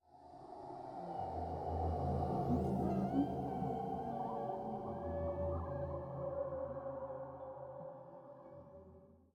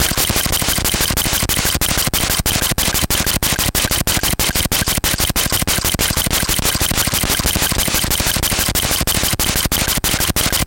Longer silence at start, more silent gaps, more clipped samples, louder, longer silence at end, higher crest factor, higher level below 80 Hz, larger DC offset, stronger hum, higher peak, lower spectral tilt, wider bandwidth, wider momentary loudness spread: about the same, 0.1 s vs 0 s; neither; neither; second, -41 LUFS vs -15 LUFS; first, 0.2 s vs 0 s; about the same, 16 dB vs 16 dB; second, -58 dBFS vs -26 dBFS; neither; neither; second, -24 dBFS vs 0 dBFS; first, -10 dB/octave vs -2 dB/octave; second, 9.6 kHz vs 17 kHz; first, 19 LU vs 1 LU